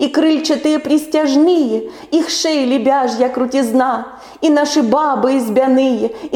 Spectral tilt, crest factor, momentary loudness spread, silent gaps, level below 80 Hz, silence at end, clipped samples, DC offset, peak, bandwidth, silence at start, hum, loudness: -4 dB/octave; 12 dB; 6 LU; none; -56 dBFS; 0 s; under 0.1%; under 0.1%; -2 dBFS; 17.5 kHz; 0 s; none; -14 LUFS